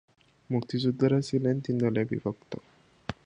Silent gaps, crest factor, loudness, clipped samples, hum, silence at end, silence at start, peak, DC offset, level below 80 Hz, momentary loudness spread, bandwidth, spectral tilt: none; 18 dB; -28 LUFS; under 0.1%; none; 0.1 s; 0.5 s; -10 dBFS; under 0.1%; -60 dBFS; 16 LU; 10 kHz; -7.5 dB/octave